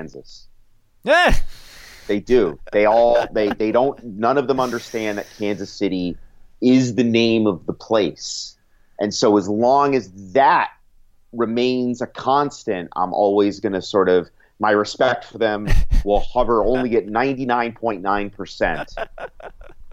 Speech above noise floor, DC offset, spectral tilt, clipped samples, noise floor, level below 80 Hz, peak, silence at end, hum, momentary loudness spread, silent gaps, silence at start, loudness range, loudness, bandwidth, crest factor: 33 dB; under 0.1%; -5.5 dB/octave; under 0.1%; -51 dBFS; -30 dBFS; -4 dBFS; 0 s; none; 12 LU; none; 0 s; 3 LU; -19 LUFS; 13 kHz; 14 dB